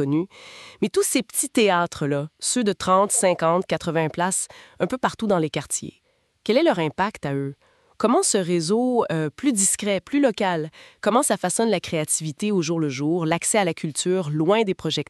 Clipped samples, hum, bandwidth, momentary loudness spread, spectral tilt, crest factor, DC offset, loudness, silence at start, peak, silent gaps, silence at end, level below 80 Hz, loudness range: under 0.1%; none; 13.5 kHz; 9 LU; -4 dB/octave; 18 dB; under 0.1%; -22 LUFS; 0 s; -6 dBFS; none; 0.05 s; -60 dBFS; 3 LU